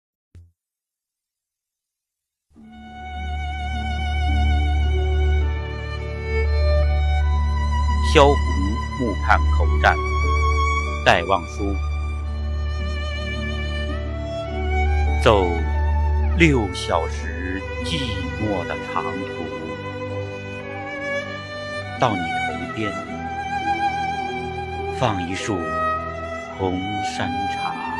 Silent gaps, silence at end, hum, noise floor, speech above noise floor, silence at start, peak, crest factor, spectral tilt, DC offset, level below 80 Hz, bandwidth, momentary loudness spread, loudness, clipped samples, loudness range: none; 0 s; none; -87 dBFS; 67 dB; 0.35 s; 0 dBFS; 22 dB; -6 dB/octave; under 0.1%; -26 dBFS; 10.5 kHz; 12 LU; -22 LUFS; under 0.1%; 8 LU